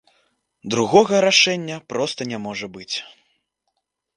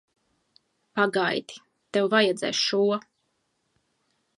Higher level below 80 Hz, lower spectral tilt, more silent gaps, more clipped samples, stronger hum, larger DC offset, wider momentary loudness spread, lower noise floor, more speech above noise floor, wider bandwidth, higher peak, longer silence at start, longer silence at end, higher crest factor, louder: first, -64 dBFS vs -78 dBFS; about the same, -3 dB/octave vs -3.5 dB/octave; neither; neither; neither; neither; first, 15 LU vs 10 LU; about the same, -76 dBFS vs -74 dBFS; first, 56 dB vs 50 dB; about the same, 11 kHz vs 11 kHz; first, 0 dBFS vs -4 dBFS; second, 0.65 s vs 0.95 s; second, 1.1 s vs 1.4 s; about the same, 22 dB vs 22 dB; first, -19 LUFS vs -25 LUFS